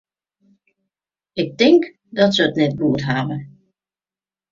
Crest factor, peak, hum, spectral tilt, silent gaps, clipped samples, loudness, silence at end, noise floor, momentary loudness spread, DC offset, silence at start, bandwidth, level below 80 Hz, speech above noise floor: 18 dB; -2 dBFS; none; -6 dB/octave; none; under 0.1%; -18 LUFS; 1.05 s; under -90 dBFS; 13 LU; under 0.1%; 1.35 s; 7.4 kHz; -56 dBFS; over 73 dB